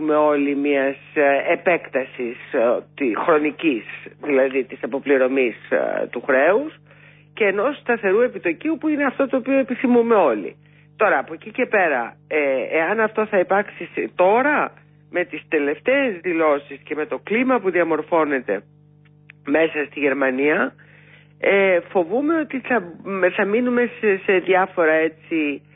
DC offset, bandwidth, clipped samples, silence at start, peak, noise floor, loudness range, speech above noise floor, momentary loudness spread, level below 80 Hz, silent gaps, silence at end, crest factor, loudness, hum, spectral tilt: under 0.1%; 3.9 kHz; under 0.1%; 0 s; -6 dBFS; -51 dBFS; 2 LU; 31 dB; 9 LU; -68 dBFS; none; 0.2 s; 14 dB; -20 LUFS; 50 Hz at -50 dBFS; -10.5 dB/octave